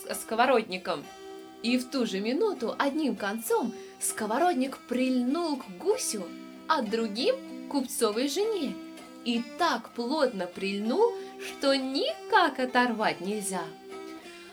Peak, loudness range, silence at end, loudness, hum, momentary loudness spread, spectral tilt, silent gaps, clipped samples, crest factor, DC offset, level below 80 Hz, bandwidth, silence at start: -10 dBFS; 3 LU; 0 s; -29 LUFS; none; 13 LU; -3.5 dB/octave; none; under 0.1%; 20 dB; under 0.1%; -72 dBFS; over 20 kHz; 0 s